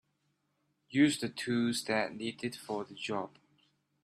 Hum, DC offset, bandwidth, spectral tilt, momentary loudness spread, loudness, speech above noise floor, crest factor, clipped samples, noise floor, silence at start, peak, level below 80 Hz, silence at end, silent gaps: none; under 0.1%; 14 kHz; -4.5 dB/octave; 11 LU; -33 LUFS; 46 dB; 20 dB; under 0.1%; -79 dBFS; 0.9 s; -14 dBFS; -76 dBFS; 0.75 s; none